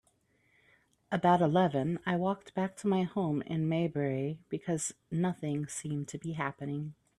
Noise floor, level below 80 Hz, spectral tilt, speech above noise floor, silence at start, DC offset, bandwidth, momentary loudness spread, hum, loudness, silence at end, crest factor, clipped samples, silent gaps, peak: -71 dBFS; -70 dBFS; -6 dB/octave; 40 dB; 1.1 s; under 0.1%; 12.5 kHz; 10 LU; none; -32 LUFS; 0.25 s; 20 dB; under 0.1%; none; -12 dBFS